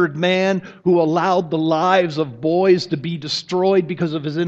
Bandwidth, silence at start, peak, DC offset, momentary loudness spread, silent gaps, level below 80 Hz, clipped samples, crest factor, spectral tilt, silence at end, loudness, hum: 8 kHz; 0 s; 0 dBFS; under 0.1%; 7 LU; none; -62 dBFS; under 0.1%; 18 dB; -6 dB/octave; 0 s; -18 LUFS; none